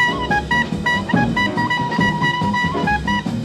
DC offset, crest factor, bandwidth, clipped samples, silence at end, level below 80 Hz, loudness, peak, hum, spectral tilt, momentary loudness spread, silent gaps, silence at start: under 0.1%; 14 dB; 14.5 kHz; under 0.1%; 0 s; -36 dBFS; -18 LUFS; -4 dBFS; none; -5.5 dB/octave; 2 LU; none; 0 s